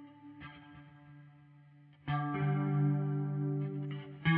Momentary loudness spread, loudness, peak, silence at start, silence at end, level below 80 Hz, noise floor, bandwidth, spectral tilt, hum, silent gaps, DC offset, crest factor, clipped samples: 24 LU; -35 LUFS; -16 dBFS; 0 s; 0 s; -68 dBFS; -59 dBFS; 4 kHz; -10.5 dB/octave; none; none; under 0.1%; 18 dB; under 0.1%